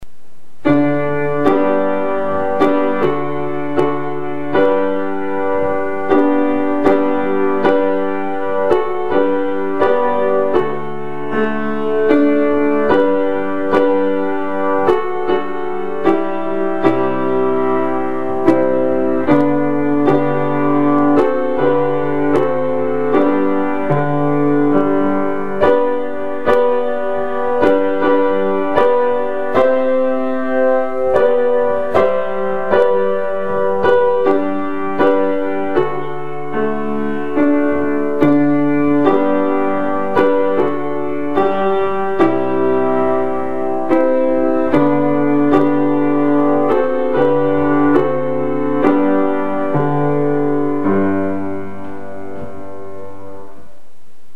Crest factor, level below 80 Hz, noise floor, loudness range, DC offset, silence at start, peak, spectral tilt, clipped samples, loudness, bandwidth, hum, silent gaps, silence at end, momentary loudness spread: 16 dB; -50 dBFS; -53 dBFS; 3 LU; 9%; 0 s; 0 dBFS; -8.5 dB/octave; under 0.1%; -16 LUFS; 5.4 kHz; none; none; 0.85 s; 7 LU